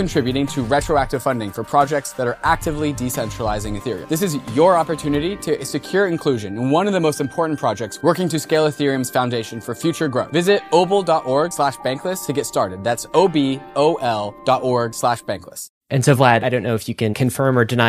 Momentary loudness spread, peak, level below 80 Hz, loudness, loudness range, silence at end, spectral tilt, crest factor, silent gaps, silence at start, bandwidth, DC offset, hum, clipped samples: 7 LU; -2 dBFS; -42 dBFS; -19 LUFS; 2 LU; 0 s; -5.5 dB/octave; 18 dB; 15.69-15.81 s; 0 s; 15.5 kHz; under 0.1%; none; under 0.1%